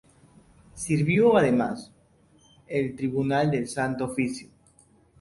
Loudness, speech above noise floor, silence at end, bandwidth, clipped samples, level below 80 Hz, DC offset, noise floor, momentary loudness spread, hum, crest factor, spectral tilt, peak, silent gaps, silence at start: -25 LUFS; 36 dB; 0.75 s; 11.5 kHz; under 0.1%; -58 dBFS; under 0.1%; -60 dBFS; 12 LU; none; 18 dB; -6.5 dB/octave; -8 dBFS; none; 0.75 s